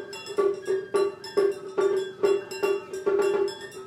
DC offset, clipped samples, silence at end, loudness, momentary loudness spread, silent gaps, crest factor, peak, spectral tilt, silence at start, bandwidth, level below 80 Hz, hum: under 0.1%; under 0.1%; 0 s; -27 LUFS; 4 LU; none; 16 dB; -12 dBFS; -4 dB/octave; 0 s; 13.5 kHz; -72 dBFS; none